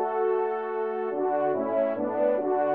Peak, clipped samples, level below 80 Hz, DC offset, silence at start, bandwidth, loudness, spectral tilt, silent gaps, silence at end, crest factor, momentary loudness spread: -12 dBFS; under 0.1%; -82 dBFS; under 0.1%; 0 s; 4.2 kHz; -27 LUFS; -5.5 dB/octave; none; 0 s; 14 dB; 4 LU